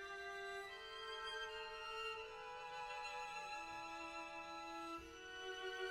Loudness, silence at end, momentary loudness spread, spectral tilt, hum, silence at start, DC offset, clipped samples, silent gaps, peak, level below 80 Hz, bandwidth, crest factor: -49 LUFS; 0 s; 4 LU; -2 dB/octave; none; 0 s; under 0.1%; under 0.1%; none; -34 dBFS; -72 dBFS; 16.5 kHz; 16 dB